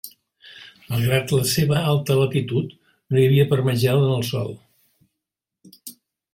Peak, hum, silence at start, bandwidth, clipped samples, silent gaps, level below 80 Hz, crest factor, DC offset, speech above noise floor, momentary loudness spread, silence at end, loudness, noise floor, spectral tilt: -6 dBFS; none; 0.05 s; 16.5 kHz; under 0.1%; none; -54 dBFS; 16 dB; under 0.1%; 65 dB; 22 LU; 0.4 s; -20 LUFS; -84 dBFS; -6 dB/octave